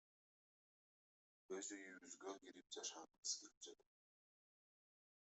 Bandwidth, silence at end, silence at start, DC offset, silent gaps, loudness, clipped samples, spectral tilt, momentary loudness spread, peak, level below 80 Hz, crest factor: 8.2 kHz; 1.65 s; 1.5 s; under 0.1%; 3.18-3.22 s, 3.57-3.61 s; -52 LUFS; under 0.1%; 0 dB/octave; 11 LU; -32 dBFS; under -90 dBFS; 26 dB